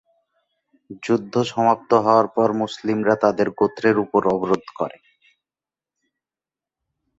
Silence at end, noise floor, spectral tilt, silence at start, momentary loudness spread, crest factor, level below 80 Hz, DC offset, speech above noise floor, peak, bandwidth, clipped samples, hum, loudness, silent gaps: 2.3 s; under -90 dBFS; -6.5 dB/octave; 0.9 s; 7 LU; 20 dB; -62 dBFS; under 0.1%; over 71 dB; -2 dBFS; 8 kHz; under 0.1%; none; -20 LUFS; none